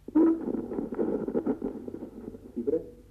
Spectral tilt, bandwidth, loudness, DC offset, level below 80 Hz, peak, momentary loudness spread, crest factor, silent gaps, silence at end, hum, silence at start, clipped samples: -10 dB/octave; 3 kHz; -30 LUFS; under 0.1%; -56 dBFS; -14 dBFS; 16 LU; 16 dB; none; 0.1 s; none; 0.1 s; under 0.1%